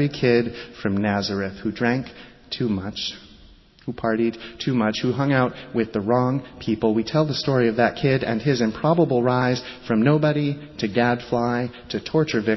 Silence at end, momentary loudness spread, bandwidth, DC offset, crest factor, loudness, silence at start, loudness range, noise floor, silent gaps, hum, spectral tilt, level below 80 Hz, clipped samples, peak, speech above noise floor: 0 s; 9 LU; 6.2 kHz; under 0.1%; 18 dB; -22 LUFS; 0 s; 6 LU; -50 dBFS; none; none; -7 dB/octave; -50 dBFS; under 0.1%; -4 dBFS; 28 dB